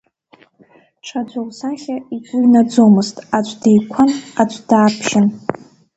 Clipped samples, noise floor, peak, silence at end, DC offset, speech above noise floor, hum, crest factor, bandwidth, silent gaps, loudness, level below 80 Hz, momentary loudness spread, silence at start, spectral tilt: under 0.1%; -51 dBFS; 0 dBFS; 0.4 s; under 0.1%; 36 dB; none; 16 dB; 8.2 kHz; none; -15 LUFS; -58 dBFS; 14 LU; 1.05 s; -6 dB/octave